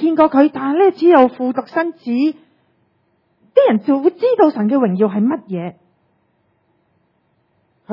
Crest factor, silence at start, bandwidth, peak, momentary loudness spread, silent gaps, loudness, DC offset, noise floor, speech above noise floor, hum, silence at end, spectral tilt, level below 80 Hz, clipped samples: 16 dB; 0 s; 5.8 kHz; 0 dBFS; 10 LU; none; -15 LUFS; under 0.1%; -63 dBFS; 49 dB; none; 0 s; -9.5 dB/octave; -64 dBFS; under 0.1%